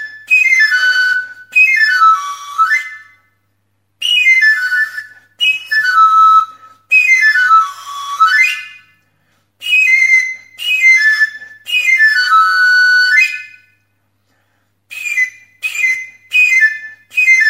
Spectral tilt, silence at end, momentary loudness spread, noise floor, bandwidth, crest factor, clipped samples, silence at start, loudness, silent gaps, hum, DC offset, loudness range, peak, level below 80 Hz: 4 dB/octave; 0 s; 13 LU; -64 dBFS; 16 kHz; 12 dB; under 0.1%; 0 s; -10 LUFS; none; none; under 0.1%; 5 LU; 0 dBFS; -76 dBFS